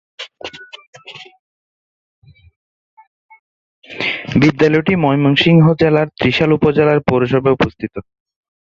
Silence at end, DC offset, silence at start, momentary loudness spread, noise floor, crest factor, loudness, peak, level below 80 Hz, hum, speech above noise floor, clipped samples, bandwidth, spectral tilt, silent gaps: 0.65 s; under 0.1%; 0.2 s; 23 LU; -33 dBFS; 16 dB; -13 LUFS; 0 dBFS; -46 dBFS; none; 21 dB; under 0.1%; 7.4 kHz; -7.5 dB/octave; 0.87-0.93 s, 1.39-2.22 s, 2.56-2.97 s, 3.07-3.29 s, 3.39-3.82 s